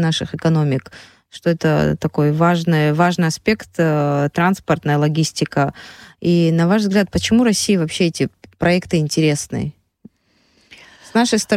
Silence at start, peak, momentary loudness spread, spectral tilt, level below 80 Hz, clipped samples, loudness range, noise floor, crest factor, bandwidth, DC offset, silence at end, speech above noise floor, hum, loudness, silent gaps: 0 s; -4 dBFS; 7 LU; -5.5 dB/octave; -46 dBFS; under 0.1%; 3 LU; -60 dBFS; 14 dB; 14.5 kHz; under 0.1%; 0 s; 43 dB; none; -17 LUFS; none